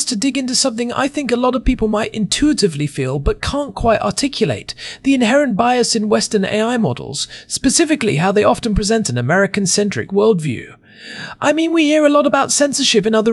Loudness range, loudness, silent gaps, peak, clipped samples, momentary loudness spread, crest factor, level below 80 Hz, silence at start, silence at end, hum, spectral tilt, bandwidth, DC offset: 2 LU; -16 LUFS; none; -2 dBFS; under 0.1%; 8 LU; 14 dB; -34 dBFS; 0 s; 0 s; none; -4 dB/octave; 13.5 kHz; under 0.1%